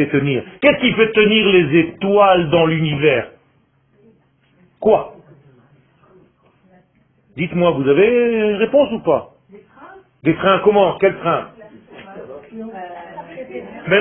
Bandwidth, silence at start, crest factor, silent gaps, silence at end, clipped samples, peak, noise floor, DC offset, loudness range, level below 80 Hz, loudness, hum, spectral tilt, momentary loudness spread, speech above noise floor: 3.9 kHz; 0 s; 18 dB; none; 0 s; under 0.1%; 0 dBFS; -58 dBFS; under 0.1%; 11 LU; -50 dBFS; -15 LUFS; none; -10.5 dB/octave; 21 LU; 43 dB